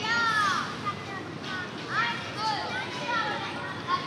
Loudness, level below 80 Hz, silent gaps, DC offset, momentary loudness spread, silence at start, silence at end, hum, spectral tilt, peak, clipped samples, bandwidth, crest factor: -29 LUFS; -68 dBFS; none; under 0.1%; 10 LU; 0 s; 0 s; none; -3.5 dB/octave; -14 dBFS; under 0.1%; 15 kHz; 16 dB